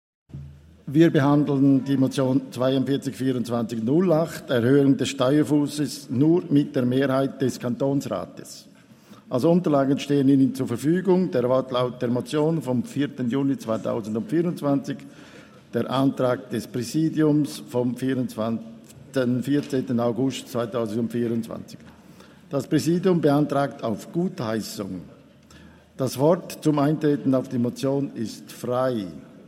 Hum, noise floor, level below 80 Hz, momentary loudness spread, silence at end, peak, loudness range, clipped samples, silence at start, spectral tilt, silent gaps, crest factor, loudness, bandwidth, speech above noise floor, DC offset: none; -49 dBFS; -64 dBFS; 11 LU; 0.05 s; -4 dBFS; 5 LU; under 0.1%; 0.35 s; -7 dB/octave; none; 18 dB; -23 LUFS; 15.5 kHz; 27 dB; under 0.1%